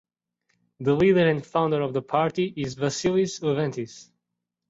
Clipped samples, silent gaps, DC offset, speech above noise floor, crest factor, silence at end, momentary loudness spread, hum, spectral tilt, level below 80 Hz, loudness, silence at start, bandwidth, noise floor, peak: under 0.1%; none; under 0.1%; 59 dB; 18 dB; 0.65 s; 10 LU; none; -6 dB/octave; -58 dBFS; -24 LUFS; 0.8 s; 8 kHz; -83 dBFS; -8 dBFS